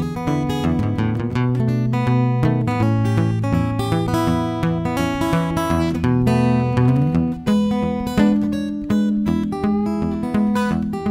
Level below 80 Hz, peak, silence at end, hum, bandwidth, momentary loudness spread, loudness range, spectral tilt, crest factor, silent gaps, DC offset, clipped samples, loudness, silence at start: -38 dBFS; -2 dBFS; 0 s; none; 15.5 kHz; 4 LU; 2 LU; -7.5 dB/octave; 16 dB; none; under 0.1%; under 0.1%; -19 LUFS; 0 s